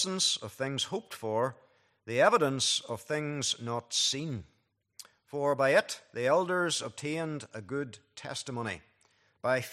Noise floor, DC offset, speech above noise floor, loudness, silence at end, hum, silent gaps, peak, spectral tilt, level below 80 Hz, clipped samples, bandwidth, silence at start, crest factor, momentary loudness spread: -69 dBFS; under 0.1%; 38 dB; -31 LUFS; 0 s; none; none; -10 dBFS; -3 dB/octave; -74 dBFS; under 0.1%; 15 kHz; 0 s; 22 dB; 14 LU